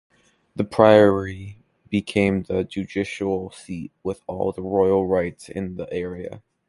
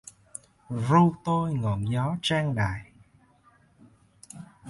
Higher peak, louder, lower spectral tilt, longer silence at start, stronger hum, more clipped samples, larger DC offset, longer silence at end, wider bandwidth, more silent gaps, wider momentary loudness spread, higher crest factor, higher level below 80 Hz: first, 0 dBFS vs -8 dBFS; first, -22 LUFS vs -26 LUFS; about the same, -7 dB/octave vs -6.5 dB/octave; second, 0.55 s vs 0.7 s; neither; neither; neither; first, 0.3 s vs 0 s; about the same, 11.5 kHz vs 11.5 kHz; neither; second, 19 LU vs 23 LU; about the same, 22 dB vs 20 dB; about the same, -48 dBFS vs -52 dBFS